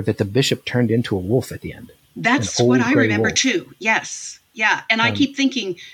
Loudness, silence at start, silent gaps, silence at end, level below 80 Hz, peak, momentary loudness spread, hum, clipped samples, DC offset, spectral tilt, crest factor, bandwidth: -18 LUFS; 0 s; none; 0 s; -58 dBFS; -2 dBFS; 12 LU; none; under 0.1%; under 0.1%; -4 dB/octave; 18 dB; 18 kHz